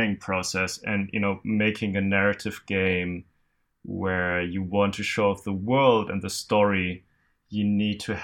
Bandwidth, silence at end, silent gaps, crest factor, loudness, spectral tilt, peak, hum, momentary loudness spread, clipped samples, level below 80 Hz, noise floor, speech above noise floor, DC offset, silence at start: 16 kHz; 0 s; none; 20 dB; -25 LUFS; -5.5 dB/octave; -6 dBFS; none; 9 LU; under 0.1%; -60 dBFS; -70 dBFS; 45 dB; under 0.1%; 0 s